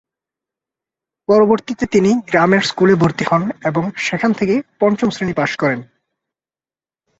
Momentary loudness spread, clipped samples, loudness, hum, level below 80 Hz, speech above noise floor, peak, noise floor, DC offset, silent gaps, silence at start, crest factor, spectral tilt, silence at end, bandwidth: 7 LU; under 0.1%; -16 LUFS; none; -52 dBFS; over 75 dB; 0 dBFS; under -90 dBFS; under 0.1%; none; 1.3 s; 16 dB; -6 dB/octave; 1.35 s; 8 kHz